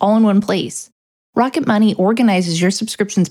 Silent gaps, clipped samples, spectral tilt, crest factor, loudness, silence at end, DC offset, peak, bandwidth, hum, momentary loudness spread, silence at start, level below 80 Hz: 0.92-1.33 s; under 0.1%; -5.5 dB/octave; 14 dB; -16 LUFS; 0 s; under 0.1%; 0 dBFS; 13.5 kHz; none; 8 LU; 0 s; -62 dBFS